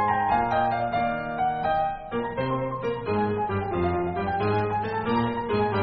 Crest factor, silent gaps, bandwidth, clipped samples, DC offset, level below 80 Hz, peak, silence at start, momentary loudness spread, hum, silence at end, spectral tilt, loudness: 14 dB; none; 5.2 kHz; under 0.1%; 0.1%; -48 dBFS; -12 dBFS; 0 s; 5 LU; none; 0 s; -5.5 dB/octave; -26 LUFS